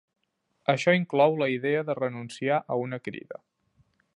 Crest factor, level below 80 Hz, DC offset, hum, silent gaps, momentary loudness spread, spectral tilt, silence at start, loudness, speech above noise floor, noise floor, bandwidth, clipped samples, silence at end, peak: 20 dB; -76 dBFS; under 0.1%; none; none; 15 LU; -6 dB/octave; 0.7 s; -26 LUFS; 50 dB; -76 dBFS; 11 kHz; under 0.1%; 0.85 s; -8 dBFS